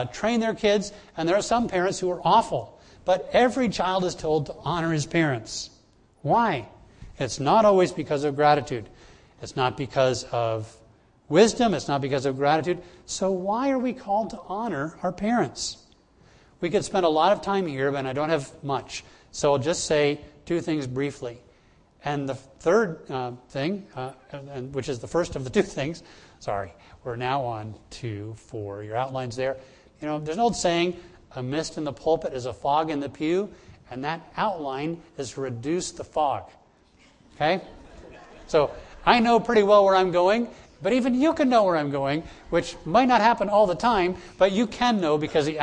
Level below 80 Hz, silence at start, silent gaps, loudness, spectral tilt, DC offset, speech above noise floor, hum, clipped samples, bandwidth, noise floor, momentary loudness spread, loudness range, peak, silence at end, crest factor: -52 dBFS; 0 s; none; -25 LUFS; -5 dB/octave; under 0.1%; 34 dB; none; under 0.1%; 10.5 kHz; -58 dBFS; 15 LU; 8 LU; -2 dBFS; 0 s; 22 dB